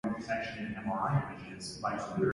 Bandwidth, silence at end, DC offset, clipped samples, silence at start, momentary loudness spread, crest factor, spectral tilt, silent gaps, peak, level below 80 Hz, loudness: 11.5 kHz; 0 s; under 0.1%; under 0.1%; 0.05 s; 10 LU; 18 dB; -6 dB/octave; none; -18 dBFS; -60 dBFS; -35 LUFS